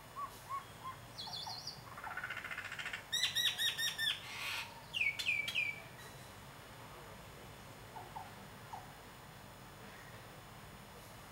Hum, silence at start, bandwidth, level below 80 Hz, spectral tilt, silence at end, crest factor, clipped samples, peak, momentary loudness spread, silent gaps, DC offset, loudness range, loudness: none; 0 s; 16 kHz; -68 dBFS; -1 dB/octave; 0 s; 22 dB; under 0.1%; -22 dBFS; 19 LU; none; under 0.1%; 16 LU; -38 LUFS